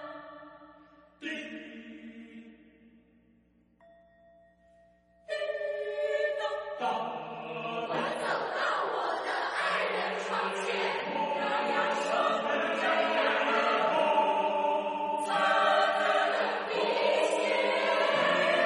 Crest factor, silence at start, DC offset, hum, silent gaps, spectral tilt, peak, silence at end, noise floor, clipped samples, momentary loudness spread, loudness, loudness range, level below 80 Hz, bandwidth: 16 dB; 0 s; under 0.1%; none; none; -3 dB/octave; -14 dBFS; 0 s; -66 dBFS; under 0.1%; 13 LU; -29 LUFS; 18 LU; -74 dBFS; 11.5 kHz